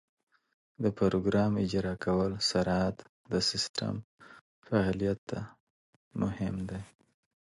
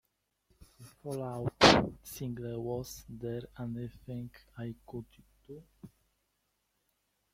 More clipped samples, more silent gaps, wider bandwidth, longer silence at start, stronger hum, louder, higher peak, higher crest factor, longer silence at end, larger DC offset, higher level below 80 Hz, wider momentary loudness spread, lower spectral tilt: neither; first, 3.09-3.24 s, 3.69-3.74 s, 4.04-4.18 s, 4.41-4.62 s, 5.18-5.27 s, 5.60-6.11 s vs none; second, 11.5 kHz vs 16.5 kHz; first, 0.8 s vs 0.6 s; neither; about the same, -31 LUFS vs -32 LUFS; second, -14 dBFS vs -4 dBFS; second, 18 dB vs 32 dB; second, 0.6 s vs 1.45 s; neither; about the same, -54 dBFS vs -58 dBFS; second, 12 LU vs 25 LU; about the same, -5.5 dB/octave vs -4.5 dB/octave